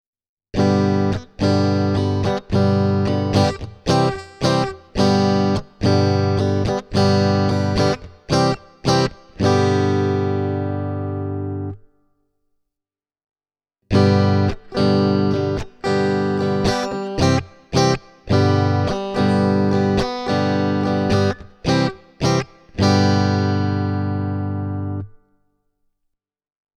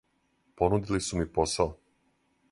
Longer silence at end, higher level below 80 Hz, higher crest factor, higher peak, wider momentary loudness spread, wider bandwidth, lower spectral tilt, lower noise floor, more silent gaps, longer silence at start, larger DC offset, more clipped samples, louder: first, 1.65 s vs 0.75 s; about the same, -42 dBFS vs -46 dBFS; second, 16 dB vs 22 dB; first, -2 dBFS vs -10 dBFS; first, 8 LU vs 3 LU; about the same, 11.5 kHz vs 11.5 kHz; first, -6.5 dB/octave vs -5 dB/octave; first, -88 dBFS vs -71 dBFS; neither; about the same, 0.55 s vs 0.6 s; neither; neither; first, -19 LUFS vs -29 LUFS